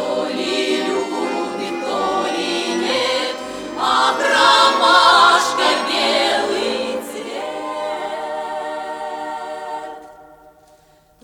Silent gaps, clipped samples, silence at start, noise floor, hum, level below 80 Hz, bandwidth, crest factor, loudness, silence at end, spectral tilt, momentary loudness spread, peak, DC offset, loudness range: none; under 0.1%; 0 s; -52 dBFS; none; -58 dBFS; 19.5 kHz; 18 dB; -17 LUFS; 1 s; -1.5 dB/octave; 16 LU; -2 dBFS; under 0.1%; 13 LU